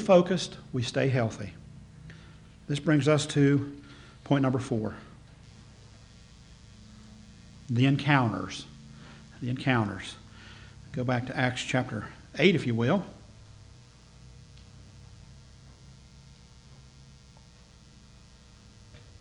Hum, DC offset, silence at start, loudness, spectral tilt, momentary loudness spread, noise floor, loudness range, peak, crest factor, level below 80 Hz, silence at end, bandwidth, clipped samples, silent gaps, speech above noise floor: none; under 0.1%; 0 s; -28 LUFS; -6 dB/octave; 26 LU; -54 dBFS; 6 LU; -8 dBFS; 22 dB; -56 dBFS; 0.2 s; 10.5 kHz; under 0.1%; none; 28 dB